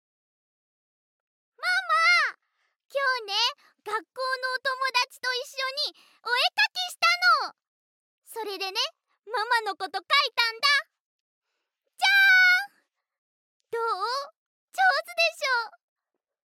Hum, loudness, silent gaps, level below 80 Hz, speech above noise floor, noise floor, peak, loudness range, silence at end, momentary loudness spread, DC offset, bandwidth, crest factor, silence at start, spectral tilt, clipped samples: none; -24 LUFS; 2.85-2.89 s, 7.68-8.22 s, 11.00-11.42 s, 13.18-13.60 s, 14.37-14.68 s; under -90 dBFS; 54 dB; -81 dBFS; -8 dBFS; 5 LU; 0.8 s; 14 LU; under 0.1%; 16.5 kHz; 20 dB; 1.6 s; 2.5 dB/octave; under 0.1%